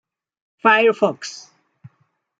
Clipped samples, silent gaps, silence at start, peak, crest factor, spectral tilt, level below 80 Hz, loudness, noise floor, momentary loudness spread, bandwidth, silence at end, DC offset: under 0.1%; none; 0.65 s; -2 dBFS; 20 dB; -4 dB/octave; -72 dBFS; -17 LUFS; -66 dBFS; 19 LU; 8 kHz; 1.05 s; under 0.1%